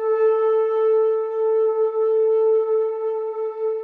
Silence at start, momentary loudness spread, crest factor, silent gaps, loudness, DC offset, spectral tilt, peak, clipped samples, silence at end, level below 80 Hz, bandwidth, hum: 0 s; 7 LU; 8 dB; none; -20 LUFS; under 0.1%; -4.5 dB/octave; -12 dBFS; under 0.1%; 0 s; under -90 dBFS; 3.3 kHz; none